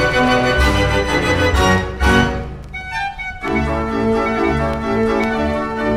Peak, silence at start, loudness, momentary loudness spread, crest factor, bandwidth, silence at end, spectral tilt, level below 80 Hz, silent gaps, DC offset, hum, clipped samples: -2 dBFS; 0 s; -17 LUFS; 9 LU; 16 dB; 15 kHz; 0 s; -5.5 dB/octave; -26 dBFS; none; under 0.1%; none; under 0.1%